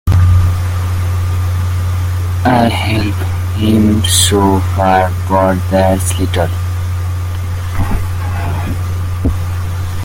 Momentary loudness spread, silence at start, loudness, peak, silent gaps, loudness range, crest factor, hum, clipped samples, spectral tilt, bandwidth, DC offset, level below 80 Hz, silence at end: 9 LU; 0.05 s; -14 LUFS; 0 dBFS; none; 6 LU; 12 dB; none; under 0.1%; -5.5 dB/octave; 16.5 kHz; under 0.1%; -28 dBFS; 0 s